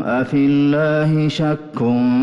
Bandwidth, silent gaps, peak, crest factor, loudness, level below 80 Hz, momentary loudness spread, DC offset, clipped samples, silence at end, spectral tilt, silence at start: 7.8 kHz; none; -8 dBFS; 8 dB; -17 LUFS; -52 dBFS; 6 LU; under 0.1%; under 0.1%; 0 s; -8 dB/octave; 0 s